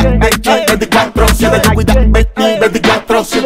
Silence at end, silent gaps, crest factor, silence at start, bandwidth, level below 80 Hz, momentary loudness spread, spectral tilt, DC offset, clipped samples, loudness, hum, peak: 0 s; none; 10 dB; 0 s; 16.5 kHz; -16 dBFS; 2 LU; -4.5 dB/octave; under 0.1%; under 0.1%; -10 LUFS; none; 0 dBFS